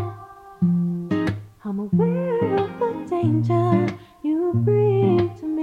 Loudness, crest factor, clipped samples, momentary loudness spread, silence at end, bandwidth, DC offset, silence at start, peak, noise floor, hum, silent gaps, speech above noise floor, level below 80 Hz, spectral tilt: -22 LUFS; 16 dB; under 0.1%; 10 LU; 0 s; 6.8 kHz; under 0.1%; 0 s; -6 dBFS; -41 dBFS; none; none; 22 dB; -54 dBFS; -10 dB/octave